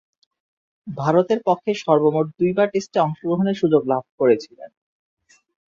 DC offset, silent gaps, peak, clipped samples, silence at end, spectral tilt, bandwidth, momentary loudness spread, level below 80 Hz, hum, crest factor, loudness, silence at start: under 0.1%; 4.09-4.18 s; -2 dBFS; under 0.1%; 1.1 s; -7 dB/octave; 7.6 kHz; 7 LU; -64 dBFS; none; 18 dB; -20 LUFS; 0.85 s